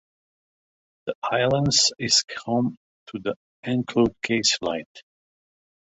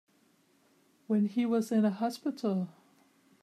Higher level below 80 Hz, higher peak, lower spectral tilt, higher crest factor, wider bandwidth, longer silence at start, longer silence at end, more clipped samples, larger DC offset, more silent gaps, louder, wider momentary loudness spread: first, -56 dBFS vs -86 dBFS; first, -6 dBFS vs -18 dBFS; second, -3 dB/octave vs -7 dB/octave; first, 20 dB vs 14 dB; second, 8.4 kHz vs 14 kHz; about the same, 1.05 s vs 1.1 s; first, 0.95 s vs 0.7 s; neither; neither; first, 1.15-1.22 s, 2.77-3.06 s, 3.36-3.63 s, 4.86-4.95 s vs none; first, -23 LUFS vs -31 LUFS; first, 14 LU vs 6 LU